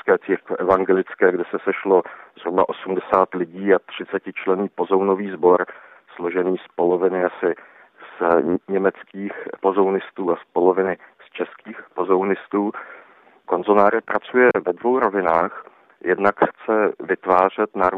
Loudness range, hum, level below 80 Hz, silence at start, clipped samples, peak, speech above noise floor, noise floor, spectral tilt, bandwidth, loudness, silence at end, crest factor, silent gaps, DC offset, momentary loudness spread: 3 LU; none; -62 dBFS; 0.05 s; under 0.1%; -2 dBFS; 30 dB; -49 dBFS; -8.5 dB/octave; 4.3 kHz; -20 LUFS; 0 s; 18 dB; none; under 0.1%; 13 LU